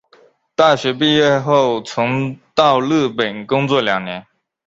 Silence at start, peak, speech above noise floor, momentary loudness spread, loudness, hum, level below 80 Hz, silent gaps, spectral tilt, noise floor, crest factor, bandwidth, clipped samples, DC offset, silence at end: 0.6 s; 0 dBFS; 36 dB; 8 LU; -16 LUFS; none; -56 dBFS; none; -5.5 dB/octave; -52 dBFS; 16 dB; 7.8 kHz; under 0.1%; under 0.1%; 0.45 s